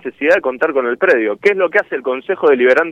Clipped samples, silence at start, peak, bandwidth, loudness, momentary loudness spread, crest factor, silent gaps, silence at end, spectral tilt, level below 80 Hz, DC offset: under 0.1%; 0.05 s; -2 dBFS; 8.4 kHz; -14 LUFS; 6 LU; 12 dB; none; 0 s; -5.5 dB/octave; -60 dBFS; under 0.1%